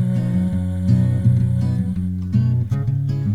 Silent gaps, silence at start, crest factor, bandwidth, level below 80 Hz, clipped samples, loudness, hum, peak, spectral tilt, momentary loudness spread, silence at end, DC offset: none; 0 s; 14 dB; 5.4 kHz; -40 dBFS; under 0.1%; -19 LUFS; none; -4 dBFS; -10 dB/octave; 5 LU; 0 s; under 0.1%